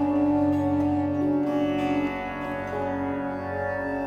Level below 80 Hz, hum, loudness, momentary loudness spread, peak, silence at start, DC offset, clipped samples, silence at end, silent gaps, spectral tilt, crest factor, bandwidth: -52 dBFS; none; -26 LUFS; 7 LU; -14 dBFS; 0 s; under 0.1%; under 0.1%; 0 s; none; -8 dB/octave; 12 dB; 6.8 kHz